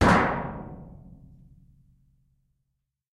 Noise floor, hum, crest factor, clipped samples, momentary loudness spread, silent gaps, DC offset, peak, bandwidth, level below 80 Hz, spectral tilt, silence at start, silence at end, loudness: -80 dBFS; none; 22 dB; under 0.1%; 26 LU; none; under 0.1%; -6 dBFS; 12.5 kHz; -44 dBFS; -6 dB/octave; 0 s; 2.25 s; -26 LUFS